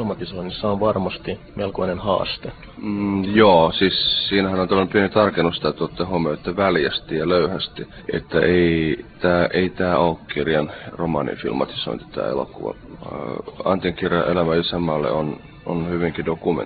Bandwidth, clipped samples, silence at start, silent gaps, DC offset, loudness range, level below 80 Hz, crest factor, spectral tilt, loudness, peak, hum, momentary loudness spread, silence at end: 4.9 kHz; under 0.1%; 0 s; none; under 0.1%; 7 LU; -44 dBFS; 20 dB; -10.5 dB/octave; -21 LUFS; 0 dBFS; none; 12 LU; 0 s